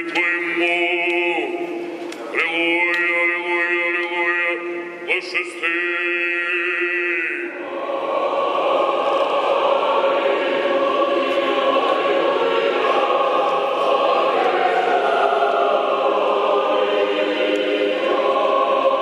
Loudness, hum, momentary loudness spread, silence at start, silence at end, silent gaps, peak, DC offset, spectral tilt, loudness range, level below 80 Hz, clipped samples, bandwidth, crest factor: -19 LUFS; none; 5 LU; 0 s; 0 s; none; -4 dBFS; under 0.1%; -3.5 dB/octave; 2 LU; -82 dBFS; under 0.1%; 11 kHz; 14 dB